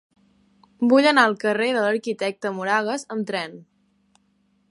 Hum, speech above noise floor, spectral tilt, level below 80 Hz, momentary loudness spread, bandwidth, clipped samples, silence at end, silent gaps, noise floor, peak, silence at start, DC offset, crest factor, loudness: none; 44 dB; -4.5 dB/octave; -76 dBFS; 12 LU; 11.5 kHz; under 0.1%; 1.1 s; none; -65 dBFS; -2 dBFS; 0.8 s; under 0.1%; 20 dB; -21 LUFS